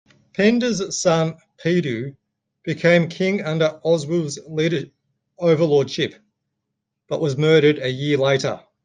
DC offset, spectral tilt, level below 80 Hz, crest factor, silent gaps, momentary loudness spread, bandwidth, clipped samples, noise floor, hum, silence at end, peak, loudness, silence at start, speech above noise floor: under 0.1%; -5.5 dB/octave; -62 dBFS; 18 dB; none; 11 LU; 9.6 kHz; under 0.1%; -79 dBFS; none; 0.25 s; -2 dBFS; -20 LUFS; 0.4 s; 60 dB